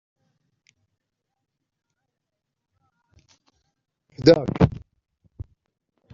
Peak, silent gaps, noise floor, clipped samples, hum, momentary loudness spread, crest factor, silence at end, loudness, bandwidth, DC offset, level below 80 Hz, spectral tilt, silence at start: -2 dBFS; none; -82 dBFS; under 0.1%; none; 26 LU; 26 dB; 0.7 s; -19 LUFS; 7.4 kHz; under 0.1%; -48 dBFS; -6.5 dB/octave; 4.2 s